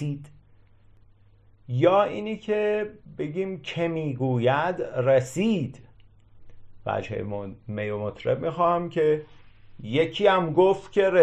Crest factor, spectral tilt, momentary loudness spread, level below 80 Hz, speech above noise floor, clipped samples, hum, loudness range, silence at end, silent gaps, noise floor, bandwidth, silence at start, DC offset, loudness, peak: 18 dB; -7 dB/octave; 13 LU; -58 dBFS; 32 dB; under 0.1%; none; 5 LU; 0 s; none; -56 dBFS; 12 kHz; 0 s; under 0.1%; -25 LUFS; -6 dBFS